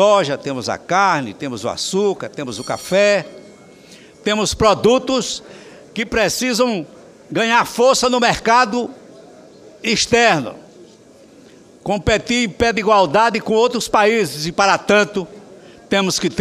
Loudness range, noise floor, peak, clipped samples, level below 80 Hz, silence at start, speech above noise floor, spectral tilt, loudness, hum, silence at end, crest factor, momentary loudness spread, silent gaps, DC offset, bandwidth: 4 LU; -45 dBFS; 0 dBFS; under 0.1%; -44 dBFS; 0 s; 29 dB; -3.5 dB/octave; -16 LUFS; none; 0 s; 18 dB; 12 LU; none; under 0.1%; 15.5 kHz